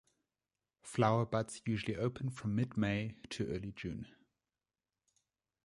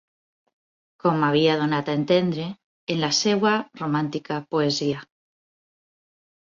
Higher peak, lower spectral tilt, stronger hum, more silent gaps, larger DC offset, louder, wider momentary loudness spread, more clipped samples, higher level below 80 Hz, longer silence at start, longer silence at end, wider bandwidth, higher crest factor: second, -16 dBFS vs -8 dBFS; first, -6.5 dB/octave vs -5 dB/octave; neither; second, none vs 2.64-2.87 s; neither; second, -37 LUFS vs -23 LUFS; about the same, 12 LU vs 10 LU; neither; about the same, -62 dBFS vs -66 dBFS; second, 0.85 s vs 1.05 s; about the same, 1.55 s vs 1.45 s; first, 11.5 kHz vs 7.6 kHz; about the same, 22 dB vs 18 dB